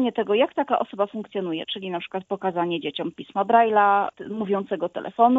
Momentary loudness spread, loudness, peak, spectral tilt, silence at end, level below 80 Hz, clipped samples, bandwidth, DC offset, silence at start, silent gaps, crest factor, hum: 11 LU; -24 LUFS; -4 dBFS; -3.5 dB/octave; 0 s; -70 dBFS; under 0.1%; 4.1 kHz; under 0.1%; 0 s; none; 18 dB; none